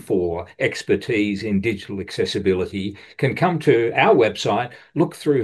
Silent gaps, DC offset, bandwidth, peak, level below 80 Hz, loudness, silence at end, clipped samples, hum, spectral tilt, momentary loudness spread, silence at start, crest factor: none; under 0.1%; 12.5 kHz; -2 dBFS; -54 dBFS; -21 LUFS; 0 s; under 0.1%; none; -6 dB/octave; 11 LU; 0.05 s; 18 dB